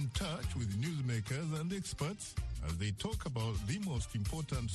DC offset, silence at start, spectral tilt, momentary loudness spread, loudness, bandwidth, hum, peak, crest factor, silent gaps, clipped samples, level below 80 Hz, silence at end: under 0.1%; 0 s; -5 dB/octave; 3 LU; -39 LUFS; 12.5 kHz; none; -24 dBFS; 14 dB; none; under 0.1%; -46 dBFS; 0 s